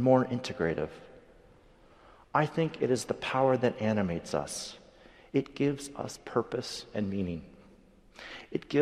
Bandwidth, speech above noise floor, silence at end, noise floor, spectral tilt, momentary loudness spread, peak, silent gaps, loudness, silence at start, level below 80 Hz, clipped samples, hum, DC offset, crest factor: 14.5 kHz; 28 dB; 0 s; -58 dBFS; -5.5 dB/octave; 14 LU; -10 dBFS; none; -31 LUFS; 0 s; -60 dBFS; under 0.1%; none; under 0.1%; 22 dB